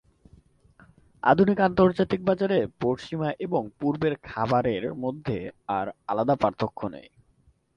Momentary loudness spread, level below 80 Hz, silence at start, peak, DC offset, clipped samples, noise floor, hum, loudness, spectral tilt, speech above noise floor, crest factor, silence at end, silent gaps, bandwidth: 11 LU; -54 dBFS; 1.25 s; -6 dBFS; under 0.1%; under 0.1%; -63 dBFS; none; -26 LUFS; -8 dB/octave; 38 dB; 20 dB; 0.75 s; none; 7.4 kHz